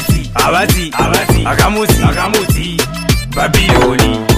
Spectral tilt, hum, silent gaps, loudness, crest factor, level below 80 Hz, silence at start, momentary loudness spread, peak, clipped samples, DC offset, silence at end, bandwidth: -4.5 dB/octave; none; none; -12 LUFS; 12 dB; -20 dBFS; 0 s; 5 LU; 0 dBFS; 0.2%; under 0.1%; 0 s; 16 kHz